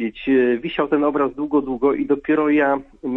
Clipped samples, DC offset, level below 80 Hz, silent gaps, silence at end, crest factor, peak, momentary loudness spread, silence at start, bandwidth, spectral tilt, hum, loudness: under 0.1%; under 0.1%; -50 dBFS; none; 0 s; 14 dB; -4 dBFS; 4 LU; 0 s; 4 kHz; -8.5 dB/octave; none; -19 LUFS